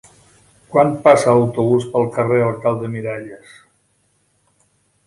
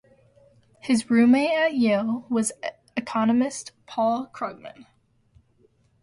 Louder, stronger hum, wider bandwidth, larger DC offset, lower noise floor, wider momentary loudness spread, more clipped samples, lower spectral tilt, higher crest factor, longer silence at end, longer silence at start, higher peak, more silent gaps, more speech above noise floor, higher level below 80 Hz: first, -16 LUFS vs -23 LUFS; first, 50 Hz at -50 dBFS vs none; about the same, 11.5 kHz vs 11.5 kHz; neither; about the same, -63 dBFS vs -62 dBFS; second, 13 LU vs 17 LU; neither; first, -7 dB/octave vs -4.5 dB/octave; about the same, 18 dB vs 16 dB; first, 1.7 s vs 1.2 s; second, 0.7 s vs 0.85 s; first, 0 dBFS vs -10 dBFS; neither; first, 47 dB vs 40 dB; first, -56 dBFS vs -66 dBFS